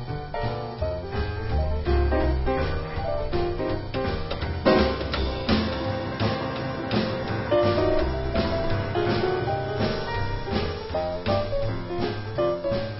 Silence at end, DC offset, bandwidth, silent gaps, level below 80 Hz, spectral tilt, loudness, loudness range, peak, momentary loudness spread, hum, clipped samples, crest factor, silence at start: 0 s; under 0.1%; 5.8 kHz; none; -32 dBFS; -10.5 dB/octave; -26 LUFS; 2 LU; -6 dBFS; 7 LU; none; under 0.1%; 20 dB; 0 s